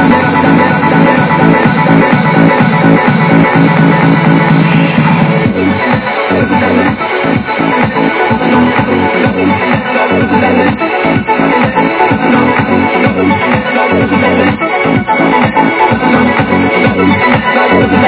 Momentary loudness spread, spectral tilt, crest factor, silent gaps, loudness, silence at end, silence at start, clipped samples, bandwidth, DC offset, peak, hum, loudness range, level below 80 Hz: 3 LU; -10.5 dB/octave; 8 dB; none; -8 LUFS; 0 s; 0 s; 1%; 4 kHz; under 0.1%; 0 dBFS; none; 3 LU; -34 dBFS